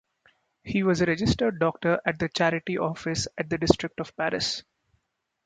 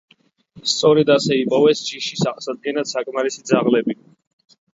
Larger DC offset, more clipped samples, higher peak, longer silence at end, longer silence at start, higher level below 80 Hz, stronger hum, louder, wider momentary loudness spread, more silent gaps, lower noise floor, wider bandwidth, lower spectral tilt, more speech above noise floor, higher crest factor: neither; neither; about the same, -2 dBFS vs -2 dBFS; about the same, 0.85 s vs 0.8 s; about the same, 0.65 s vs 0.55 s; first, -48 dBFS vs -64 dBFS; neither; second, -26 LUFS vs -19 LUFS; second, 6 LU vs 11 LU; neither; first, -77 dBFS vs -49 dBFS; first, 9.4 kHz vs 7.8 kHz; about the same, -5 dB/octave vs -4.5 dB/octave; first, 52 dB vs 31 dB; first, 24 dB vs 18 dB